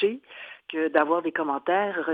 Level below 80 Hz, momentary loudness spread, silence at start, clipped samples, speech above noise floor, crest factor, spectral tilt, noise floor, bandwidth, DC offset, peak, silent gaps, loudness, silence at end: -78 dBFS; 16 LU; 0 s; under 0.1%; 20 dB; 20 dB; -7.5 dB/octave; -45 dBFS; 4.7 kHz; under 0.1%; -4 dBFS; none; -25 LUFS; 0 s